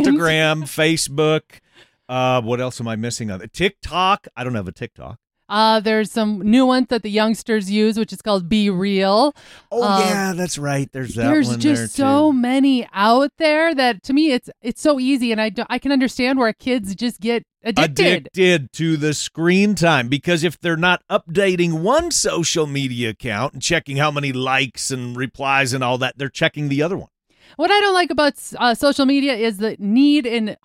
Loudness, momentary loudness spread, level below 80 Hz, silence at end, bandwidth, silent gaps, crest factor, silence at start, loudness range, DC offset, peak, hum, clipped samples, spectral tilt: -18 LUFS; 8 LU; -50 dBFS; 0.1 s; 16 kHz; none; 16 dB; 0 s; 4 LU; under 0.1%; -2 dBFS; none; under 0.1%; -4.5 dB/octave